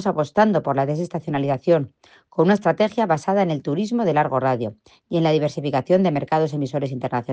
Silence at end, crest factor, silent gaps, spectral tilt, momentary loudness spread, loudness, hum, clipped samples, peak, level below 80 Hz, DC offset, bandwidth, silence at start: 0 s; 16 dB; none; -7.5 dB/octave; 7 LU; -21 LUFS; none; under 0.1%; -4 dBFS; -62 dBFS; under 0.1%; 9 kHz; 0 s